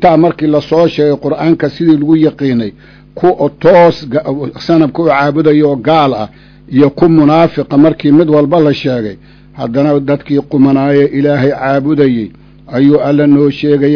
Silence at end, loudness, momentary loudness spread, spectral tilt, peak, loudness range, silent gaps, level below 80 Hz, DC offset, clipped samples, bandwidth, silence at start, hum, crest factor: 0 s; -10 LUFS; 8 LU; -9 dB/octave; 0 dBFS; 2 LU; none; -42 dBFS; under 0.1%; 2%; 5.4 kHz; 0 s; none; 10 dB